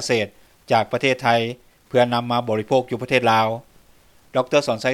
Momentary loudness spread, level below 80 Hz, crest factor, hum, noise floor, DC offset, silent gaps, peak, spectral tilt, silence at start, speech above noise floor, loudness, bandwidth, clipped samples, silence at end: 8 LU; -60 dBFS; 18 dB; none; -53 dBFS; under 0.1%; none; -2 dBFS; -5 dB/octave; 0 s; 33 dB; -20 LUFS; 15.5 kHz; under 0.1%; 0 s